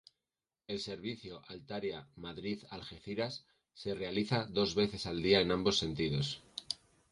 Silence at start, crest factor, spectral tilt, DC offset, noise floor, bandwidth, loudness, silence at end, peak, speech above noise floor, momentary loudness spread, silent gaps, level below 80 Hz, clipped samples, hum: 0.7 s; 24 dB; -5 dB/octave; under 0.1%; under -90 dBFS; 11.5 kHz; -36 LUFS; 0.35 s; -14 dBFS; over 54 dB; 16 LU; none; -60 dBFS; under 0.1%; none